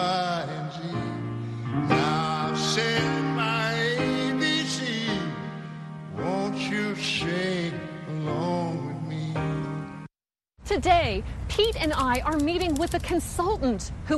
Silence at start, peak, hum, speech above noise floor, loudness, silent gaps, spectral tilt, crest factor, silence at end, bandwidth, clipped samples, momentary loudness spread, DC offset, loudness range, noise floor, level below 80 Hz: 0 s; -8 dBFS; none; 59 dB; -27 LUFS; none; -5 dB/octave; 20 dB; 0 s; 12.5 kHz; under 0.1%; 10 LU; under 0.1%; 4 LU; -85 dBFS; -42 dBFS